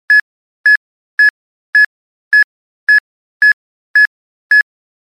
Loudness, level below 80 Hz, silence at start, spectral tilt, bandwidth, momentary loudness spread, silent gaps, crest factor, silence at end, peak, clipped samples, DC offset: -11 LUFS; -80 dBFS; 0.1 s; 5 dB/octave; 13.5 kHz; 5 LU; 0.21-0.64 s, 0.77-1.18 s, 1.30-1.73 s, 1.86-2.31 s, 2.44-2.87 s, 3.00-3.40 s, 3.53-3.94 s, 4.07-4.50 s; 10 dB; 0.4 s; -4 dBFS; under 0.1%; under 0.1%